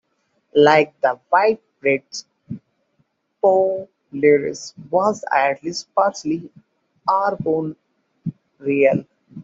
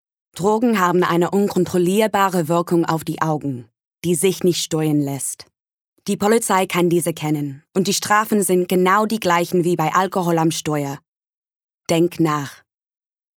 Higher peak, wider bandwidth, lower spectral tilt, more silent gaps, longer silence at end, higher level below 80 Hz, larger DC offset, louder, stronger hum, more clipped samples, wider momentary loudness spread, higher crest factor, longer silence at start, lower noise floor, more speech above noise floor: about the same, -2 dBFS vs -4 dBFS; second, 7.8 kHz vs 19 kHz; about the same, -5 dB/octave vs -5 dB/octave; second, none vs 3.87-3.91 s, 5.73-5.92 s, 11.08-11.13 s, 11.24-11.78 s; second, 0 s vs 0.8 s; about the same, -64 dBFS vs -64 dBFS; neither; about the same, -19 LUFS vs -19 LUFS; neither; neither; first, 17 LU vs 9 LU; about the same, 18 dB vs 16 dB; first, 0.55 s vs 0.35 s; second, -68 dBFS vs under -90 dBFS; second, 50 dB vs over 72 dB